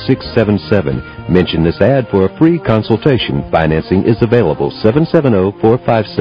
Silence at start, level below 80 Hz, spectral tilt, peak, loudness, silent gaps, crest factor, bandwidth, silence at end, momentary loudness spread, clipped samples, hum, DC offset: 0 s; -32 dBFS; -9.5 dB/octave; 0 dBFS; -13 LUFS; none; 12 dB; 6 kHz; 0 s; 4 LU; 0.8%; none; 0.2%